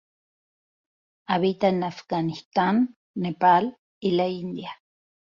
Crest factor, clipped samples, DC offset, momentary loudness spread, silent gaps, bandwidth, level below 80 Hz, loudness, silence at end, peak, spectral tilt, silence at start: 18 dB; under 0.1%; under 0.1%; 13 LU; 2.46-2.51 s, 2.96-3.14 s, 3.78-4.01 s; 7.2 kHz; -66 dBFS; -24 LUFS; 0.65 s; -8 dBFS; -7.5 dB/octave; 1.3 s